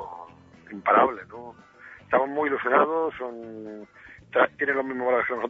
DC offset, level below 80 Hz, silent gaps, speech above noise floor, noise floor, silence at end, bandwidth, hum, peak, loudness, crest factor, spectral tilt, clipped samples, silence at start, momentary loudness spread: under 0.1%; -66 dBFS; none; 23 dB; -48 dBFS; 0 s; 6.6 kHz; none; -6 dBFS; -24 LUFS; 20 dB; -7 dB/octave; under 0.1%; 0 s; 22 LU